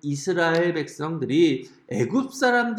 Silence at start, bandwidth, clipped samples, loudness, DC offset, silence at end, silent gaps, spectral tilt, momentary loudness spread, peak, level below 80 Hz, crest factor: 0.05 s; 13.5 kHz; under 0.1%; -23 LUFS; under 0.1%; 0 s; none; -5.5 dB/octave; 9 LU; -8 dBFS; -72 dBFS; 14 dB